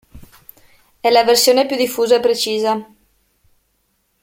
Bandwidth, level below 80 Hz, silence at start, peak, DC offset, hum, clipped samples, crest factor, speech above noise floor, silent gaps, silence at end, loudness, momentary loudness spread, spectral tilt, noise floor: 16.5 kHz; -54 dBFS; 0.15 s; -2 dBFS; under 0.1%; none; under 0.1%; 16 dB; 51 dB; none; 1.4 s; -15 LUFS; 9 LU; -2 dB/octave; -65 dBFS